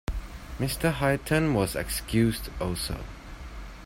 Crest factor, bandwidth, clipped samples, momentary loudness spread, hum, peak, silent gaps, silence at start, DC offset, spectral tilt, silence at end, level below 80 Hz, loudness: 18 dB; 16.5 kHz; under 0.1%; 18 LU; none; -10 dBFS; none; 0.1 s; under 0.1%; -5 dB/octave; 0 s; -38 dBFS; -28 LUFS